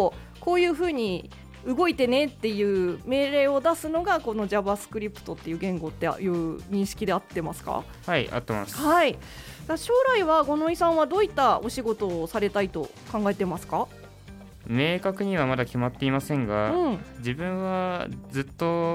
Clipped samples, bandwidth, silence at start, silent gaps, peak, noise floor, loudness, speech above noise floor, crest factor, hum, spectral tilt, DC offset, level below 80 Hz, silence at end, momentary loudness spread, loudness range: under 0.1%; 16.5 kHz; 0 s; none; -10 dBFS; -45 dBFS; -26 LUFS; 20 dB; 16 dB; none; -5.5 dB/octave; under 0.1%; -50 dBFS; 0 s; 11 LU; 5 LU